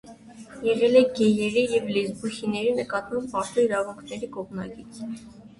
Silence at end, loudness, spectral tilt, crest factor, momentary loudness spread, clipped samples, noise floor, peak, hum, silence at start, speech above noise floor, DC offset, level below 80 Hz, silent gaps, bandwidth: 0.1 s; -24 LUFS; -5 dB/octave; 20 dB; 18 LU; under 0.1%; -45 dBFS; -6 dBFS; none; 0.05 s; 21 dB; under 0.1%; -60 dBFS; none; 11.5 kHz